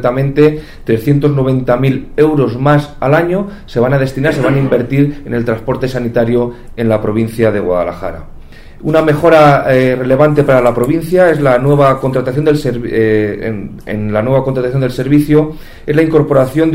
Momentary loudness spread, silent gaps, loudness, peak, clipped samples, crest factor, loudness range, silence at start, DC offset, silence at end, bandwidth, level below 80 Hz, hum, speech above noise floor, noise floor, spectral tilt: 9 LU; none; -12 LUFS; 0 dBFS; under 0.1%; 12 dB; 5 LU; 0 s; under 0.1%; 0 s; 16 kHz; -32 dBFS; none; 20 dB; -31 dBFS; -8 dB/octave